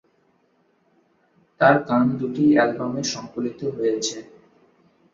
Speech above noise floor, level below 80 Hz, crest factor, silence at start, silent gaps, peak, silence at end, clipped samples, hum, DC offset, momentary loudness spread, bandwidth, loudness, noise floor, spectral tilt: 43 dB; -64 dBFS; 22 dB; 1.6 s; none; -2 dBFS; 0.9 s; under 0.1%; none; under 0.1%; 11 LU; 7.8 kHz; -21 LUFS; -64 dBFS; -5 dB/octave